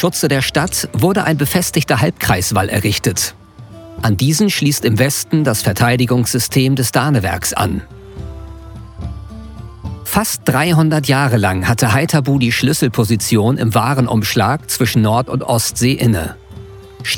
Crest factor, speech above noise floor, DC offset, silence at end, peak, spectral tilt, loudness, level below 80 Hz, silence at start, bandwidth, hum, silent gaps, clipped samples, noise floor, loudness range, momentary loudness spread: 14 dB; 22 dB; under 0.1%; 0 s; 0 dBFS; -4.5 dB/octave; -15 LUFS; -38 dBFS; 0 s; 19.5 kHz; none; none; under 0.1%; -36 dBFS; 5 LU; 17 LU